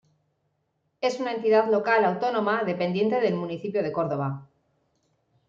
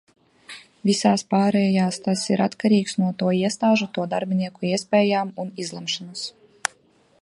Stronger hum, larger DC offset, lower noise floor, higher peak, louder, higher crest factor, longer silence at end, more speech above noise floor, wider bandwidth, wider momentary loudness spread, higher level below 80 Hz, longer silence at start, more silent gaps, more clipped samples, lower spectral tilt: neither; neither; first, -74 dBFS vs -59 dBFS; second, -8 dBFS vs -2 dBFS; second, -25 LUFS vs -22 LUFS; about the same, 18 dB vs 22 dB; first, 1.05 s vs 0.9 s; first, 50 dB vs 37 dB; second, 7.6 kHz vs 11.5 kHz; second, 8 LU vs 11 LU; about the same, -72 dBFS vs -68 dBFS; first, 1 s vs 0.5 s; neither; neither; first, -6.5 dB/octave vs -5 dB/octave